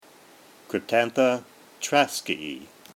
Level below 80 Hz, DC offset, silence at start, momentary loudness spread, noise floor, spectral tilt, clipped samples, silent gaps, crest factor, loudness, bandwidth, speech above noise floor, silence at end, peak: -72 dBFS; under 0.1%; 0.7 s; 12 LU; -52 dBFS; -3 dB/octave; under 0.1%; none; 22 dB; -25 LUFS; 17.5 kHz; 28 dB; 0.3 s; -4 dBFS